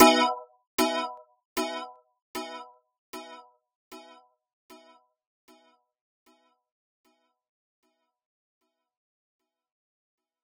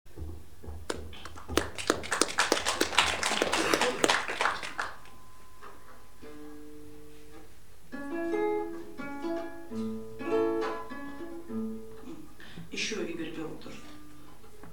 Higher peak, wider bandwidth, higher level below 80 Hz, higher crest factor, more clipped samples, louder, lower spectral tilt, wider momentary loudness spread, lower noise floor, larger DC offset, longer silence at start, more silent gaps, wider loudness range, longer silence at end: second, -4 dBFS vs 0 dBFS; first, over 20 kHz vs 18 kHz; second, -70 dBFS vs -54 dBFS; about the same, 28 dB vs 32 dB; neither; about the same, -29 LUFS vs -31 LUFS; about the same, -1.5 dB/octave vs -2.5 dB/octave; about the same, 23 LU vs 24 LU; first, -63 dBFS vs -55 dBFS; second, under 0.1% vs 0.9%; about the same, 0 s vs 0.05 s; first, 0.67-0.78 s, 1.45-1.56 s, 2.22-2.34 s, 2.98-3.13 s, 3.75-3.91 s vs none; first, 24 LU vs 12 LU; first, 6.45 s vs 0 s